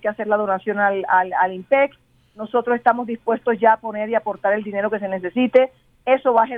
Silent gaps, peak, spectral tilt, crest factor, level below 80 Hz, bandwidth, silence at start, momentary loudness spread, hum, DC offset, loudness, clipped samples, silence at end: none; -2 dBFS; -8 dB/octave; 18 dB; -64 dBFS; 4.5 kHz; 0.05 s; 7 LU; none; under 0.1%; -20 LUFS; under 0.1%; 0 s